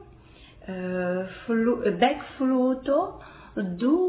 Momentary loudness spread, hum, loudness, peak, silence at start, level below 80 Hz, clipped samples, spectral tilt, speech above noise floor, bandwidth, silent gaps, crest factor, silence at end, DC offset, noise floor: 13 LU; none; -26 LUFS; -8 dBFS; 0 s; -54 dBFS; under 0.1%; -10.5 dB/octave; 25 dB; 4 kHz; none; 18 dB; 0 s; under 0.1%; -50 dBFS